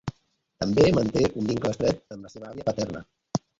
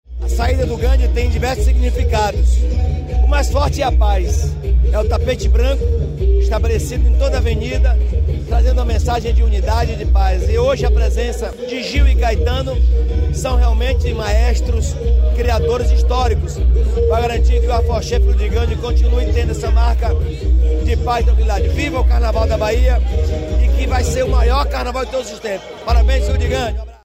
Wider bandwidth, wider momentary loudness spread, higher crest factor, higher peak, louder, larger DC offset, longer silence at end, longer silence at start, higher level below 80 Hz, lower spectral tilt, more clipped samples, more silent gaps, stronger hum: second, 7.8 kHz vs 8.8 kHz; first, 20 LU vs 4 LU; first, 20 dB vs 10 dB; about the same, -6 dBFS vs -4 dBFS; second, -25 LUFS vs -17 LUFS; neither; about the same, 0.2 s vs 0.1 s; about the same, 0.05 s vs 0.1 s; second, -48 dBFS vs -14 dBFS; about the same, -6 dB/octave vs -6 dB/octave; neither; neither; neither